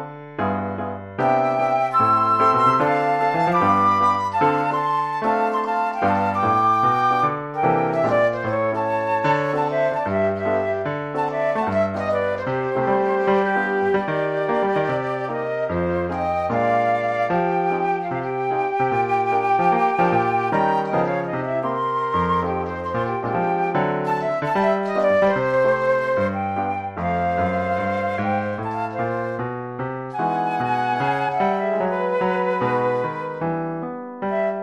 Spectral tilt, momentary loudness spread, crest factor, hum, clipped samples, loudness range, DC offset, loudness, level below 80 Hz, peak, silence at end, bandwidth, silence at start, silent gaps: -7.5 dB/octave; 8 LU; 16 dB; none; under 0.1%; 4 LU; under 0.1%; -21 LUFS; -54 dBFS; -6 dBFS; 0 s; 12 kHz; 0 s; none